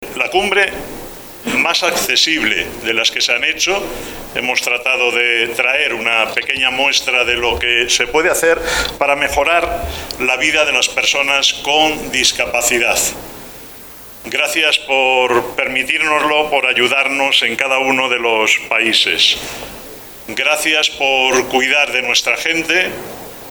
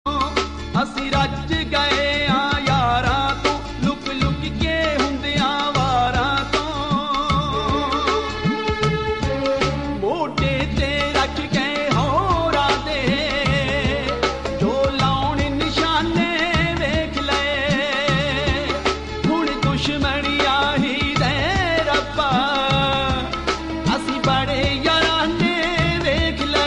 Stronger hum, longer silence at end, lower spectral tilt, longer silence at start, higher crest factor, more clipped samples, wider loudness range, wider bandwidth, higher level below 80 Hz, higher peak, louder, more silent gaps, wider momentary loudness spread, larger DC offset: neither; about the same, 0 s vs 0 s; second, -1 dB/octave vs -5 dB/octave; about the same, 0 s vs 0.05 s; about the same, 16 dB vs 16 dB; neither; about the same, 2 LU vs 2 LU; first, over 20 kHz vs 11 kHz; second, -40 dBFS vs -32 dBFS; first, 0 dBFS vs -4 dBFS; first, -13 LUFS vs -20 LUFS; neither; first, 14 LU vs 4 LU; second, under 0.1% vs 0.3%